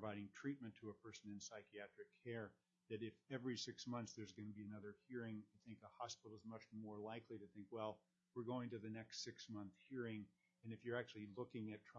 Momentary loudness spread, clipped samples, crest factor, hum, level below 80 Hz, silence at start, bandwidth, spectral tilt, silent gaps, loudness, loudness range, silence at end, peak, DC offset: 9 LU; under 0.1%; 20 dB; none; under -90 dBFS; 0 s; 7.2 kHz; -4.5 dB/octave; none; -53 LUFS; 3 LU; 0 s; -32 dBFS; under 0.1%